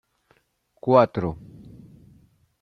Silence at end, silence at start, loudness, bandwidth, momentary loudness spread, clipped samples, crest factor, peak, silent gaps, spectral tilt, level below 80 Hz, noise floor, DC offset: 1.25 s; 0.85 s; -22 LUFS; 6.2 kHz; 23 LU; under 0.1%; 22 dB; -4 dBFS; none; -9 dB/octave; -56 dBFS; -67 dBFS; under 0.1%